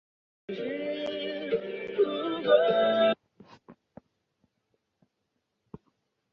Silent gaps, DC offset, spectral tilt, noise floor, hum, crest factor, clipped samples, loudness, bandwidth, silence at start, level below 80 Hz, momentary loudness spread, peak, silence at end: none; under 0.1%; -6.5 dB/octave; -80 dBFS; none; 22 dB; under 0.1%; -28 LUFS; 6 kHz; 0.5 s; -72 dBFS; 13 LU; -8 dBFS; 2.6 s